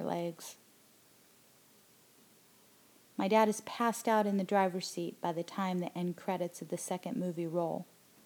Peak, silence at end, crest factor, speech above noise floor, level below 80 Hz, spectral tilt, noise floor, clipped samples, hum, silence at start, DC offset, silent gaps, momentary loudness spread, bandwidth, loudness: -14 dBFS; 0.4 s; 22 dB; 30 dB; under -90 dBFS; -5.5 dB/octave; -64 dBFS; under 0.1%; none; 0 s; under 0.1%; none; 11 LU; over 20 kHz; -34 LUFS